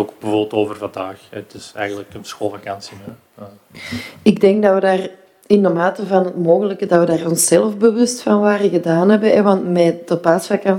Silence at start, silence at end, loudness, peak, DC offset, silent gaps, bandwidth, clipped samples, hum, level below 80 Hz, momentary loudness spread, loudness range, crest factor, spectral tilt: 0 s; 0 s; -15 LUFS; 0 dBFS; under 0.1%; none; 16.5 kHz; under 0.1%; none; -60 dBFS; 17 LU; 11 LU; 16 dB; -5.5 dB/octave